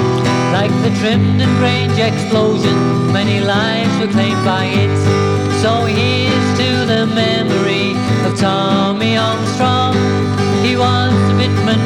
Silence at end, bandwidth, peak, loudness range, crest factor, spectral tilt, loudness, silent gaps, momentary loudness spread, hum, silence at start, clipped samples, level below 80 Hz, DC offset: 0 s; 11.5 kHz; -2 dBFS; 1 LU; 10 dB; -6 dB/octave; -14 LUFS; none; 2 LU; none; 0 s; under 0.1%; -44 dBFS; under 0.1%